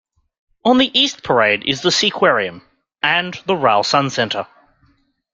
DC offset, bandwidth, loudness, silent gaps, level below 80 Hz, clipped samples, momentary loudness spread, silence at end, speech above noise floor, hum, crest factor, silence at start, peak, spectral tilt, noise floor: under 0.1%; 9.4 kHz; -16 LUFS; none; -58 dBFS; under 0.1%; 7 LU; 0.9 s; 43 dB; none; 16 dB; 0.65 s; -2 dBFS; -3.5 dB/octave; -59 dBFS